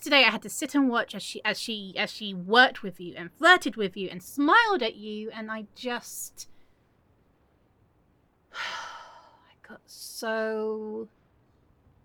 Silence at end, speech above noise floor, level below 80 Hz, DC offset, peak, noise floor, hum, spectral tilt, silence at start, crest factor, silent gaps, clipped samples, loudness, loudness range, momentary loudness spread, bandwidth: 1 s; 39 dB; -70 dBFS; under 0.1%; -4 dBFS; -66 dBFS; none; -3 dB/octave; 0 s; 26 dB; none; under 0.1%; -26 LUFS; 18 LU; 20 LU; over 20 kHz